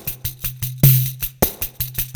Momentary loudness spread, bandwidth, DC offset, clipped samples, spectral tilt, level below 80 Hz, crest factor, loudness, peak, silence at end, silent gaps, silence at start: 11 LU; over 20 kHz; under 0.1%; under 0.1%; -5 dB/octave; -36 dBFS; 20 dB; -19 LUFS; 0 dBFS; 0 s; none; 0 s